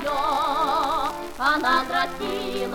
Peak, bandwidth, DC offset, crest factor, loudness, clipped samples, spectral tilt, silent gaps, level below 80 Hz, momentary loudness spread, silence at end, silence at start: -8 dBFS; 19 kHz; under 0.1%; 16 dB; -23 LUFS; under 0.1%; -3 dB/octave; none; -46 dBFS; 7 LU; 0 s; 0 s